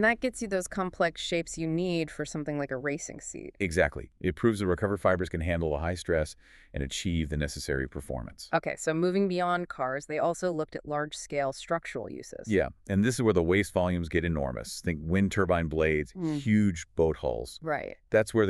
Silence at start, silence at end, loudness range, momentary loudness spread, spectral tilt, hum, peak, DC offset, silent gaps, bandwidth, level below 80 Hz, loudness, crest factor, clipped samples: 0 s; 0 s; 4 LU; 8 LU; -5.5 dB/octave; none; -10 dBFS; under 0.1%; none; 13 kHz; -46 dBFS; -30 LUFS; 20 dB; under 0.1%